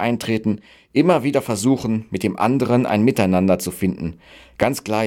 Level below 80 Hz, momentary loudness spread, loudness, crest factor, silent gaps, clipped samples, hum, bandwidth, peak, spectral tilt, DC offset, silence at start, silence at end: -50 dBFS; 8 LU; -19 LUFS; 16 dB; none; under 0.1%; none; 17.5 kHz; -4 dBFS; -6 dB/octave; under 0.1%; 0 s; 0 s